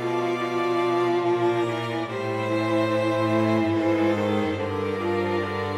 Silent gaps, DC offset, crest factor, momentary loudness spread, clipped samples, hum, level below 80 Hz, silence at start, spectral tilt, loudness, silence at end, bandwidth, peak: none; under 0.1%; 12 dB; 5 LU; under 0.1%; none; -66 dBFS; 0 s; -7 dB/octave; -24 LUFS; 0 s; 12 kHz; -12 dBFS